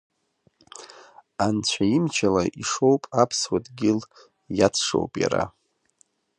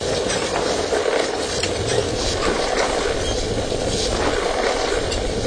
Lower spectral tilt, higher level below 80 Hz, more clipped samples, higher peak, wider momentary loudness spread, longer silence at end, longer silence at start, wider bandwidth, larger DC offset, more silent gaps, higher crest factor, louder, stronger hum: about the same, -4.5 dB/octave vs -3.5 dB/octave; second, -54 dBFS vs -32 dBFS; neither; about the same, -4 dBFS vs -4 dBFS; first, 11 LU vs 2 LU; first, 0.9 s vs 0 s; first, 0.75 s vs 0 s; about the same, 11.5 kHz vs 10.5 kHz; neither; neither; about the same, 20 dB vs 16 dB; about the same, -23 LUFS vs -21 LUFS; neither